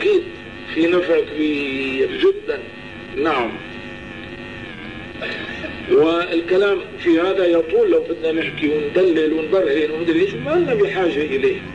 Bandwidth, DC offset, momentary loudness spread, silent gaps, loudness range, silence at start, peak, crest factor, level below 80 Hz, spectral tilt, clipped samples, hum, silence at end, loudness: 9.4 kHz; 0.3%; 16 LU; none; 6 LU; 0 s; -6 dBFS; 12 dB; -48 dBFS; -6.5 dB/octave; under 0.1%; none; 0 s; -19 LUFS